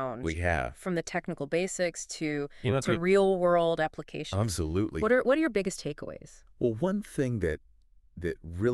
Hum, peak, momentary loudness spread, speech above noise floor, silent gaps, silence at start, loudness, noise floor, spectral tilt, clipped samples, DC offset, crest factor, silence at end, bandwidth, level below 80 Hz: none; -12 dBFS; 12 LU; 26 dB; none; 0 s; -29 LUFS; -55 dBFS; -5.5 dB/octave; under 0.1%; under 0.1%; 18 dB; 0 s; 13 kHz; -48 dBFS